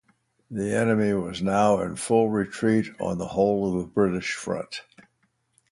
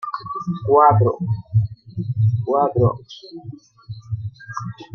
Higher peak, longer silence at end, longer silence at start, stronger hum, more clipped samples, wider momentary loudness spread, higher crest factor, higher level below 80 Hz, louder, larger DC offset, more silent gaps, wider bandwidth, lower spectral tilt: second, -8 dBFS vs -2 dBFS; first, 0.9 s vs 0.1 s; first, 0.5 s vs 0 s; neither; neither; second, 9 LU vs 23 LU; about the same, 18 dB vs 18 dB; about the same, -54 dBFS vs -50 dBFS; second, -25 LUFS vs -19 LUFS; neither; neither; first, 11.5 kHz vs 6.2 kHz; second, -6 dB/octave vs -9 dB/octave